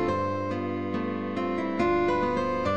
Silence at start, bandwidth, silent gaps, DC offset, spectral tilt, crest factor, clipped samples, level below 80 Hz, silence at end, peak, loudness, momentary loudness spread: 0 s; 8.6 kHz; none; 0.4%; -7 dB/octave; 14 dB; under 0.1%; -50 dBFS; 0 s; -14 dBFS; -28 LUFS; 6 LU